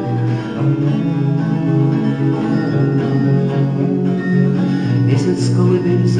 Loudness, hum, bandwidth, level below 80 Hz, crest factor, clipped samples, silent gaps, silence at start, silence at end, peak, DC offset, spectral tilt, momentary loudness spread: -16 LUFS; none; 9.6 kHz; -52 dBFS; 12 dB; under 0.1%; none; 0 s; 0 s; -2 dBFS; 0.1%; -8.5 dB/octave; 3 LU